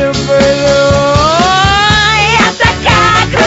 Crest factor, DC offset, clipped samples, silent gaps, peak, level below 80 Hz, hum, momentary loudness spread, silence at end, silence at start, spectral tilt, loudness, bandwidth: 8 dB; under 0.1%; 0.2%; none; 0 dBFS; -24 dBFS; none; 2 LU; 0 s; 0 s; -4 dB/octave; -8 LUFS; 8.2 kHz